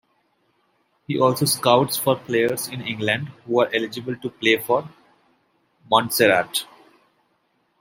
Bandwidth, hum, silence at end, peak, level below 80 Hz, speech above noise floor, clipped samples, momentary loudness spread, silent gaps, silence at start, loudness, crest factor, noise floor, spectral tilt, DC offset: 16.5 kHz; none; 1.15 s; -2 dBFS; -66 dBFS; 47 dB; under 0.1%; 11 LU; none; 1.1 s; -21 LUFS; 22 dB; -67 dBFS; -4 dB/octave; under 0.1%